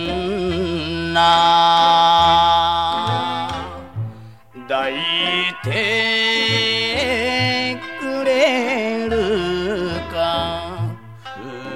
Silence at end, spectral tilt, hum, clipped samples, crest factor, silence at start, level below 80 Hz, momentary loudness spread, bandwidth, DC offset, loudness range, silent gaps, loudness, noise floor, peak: 0 s; -4.5 dB/octave; none; under 0.1%; 16 dB; 0 s; -42 dBFS; 15 LU; 14.5 kHz; 0.4%; 6 LU; none; -17 LUFS; -39 dBFS; -4 dBFS